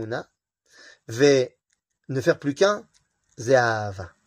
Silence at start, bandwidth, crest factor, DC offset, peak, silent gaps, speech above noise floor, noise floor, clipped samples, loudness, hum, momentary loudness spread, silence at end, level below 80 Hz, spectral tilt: 0 s; 15.5 kHz; 18 dB; under 0.1%; -6 dBFS; none; 52 dB; -75 dBFS; under 0.1%; -23 LUFS; none; 15 LU; 0.2 s; -64 dBFS; -5 dB/octave